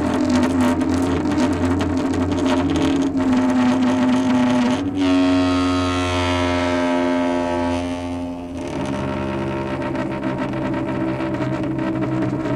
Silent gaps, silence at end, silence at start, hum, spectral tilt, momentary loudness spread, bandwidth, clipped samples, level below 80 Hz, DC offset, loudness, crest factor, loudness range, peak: none; 0 s; 0 s; none; -6 dB/octave; 7 LU; 11 kHz; under 0.1%; -42 dBFS; under 0.1%; -20 LUFS; 14 dB; 6 LU; -6 dBFS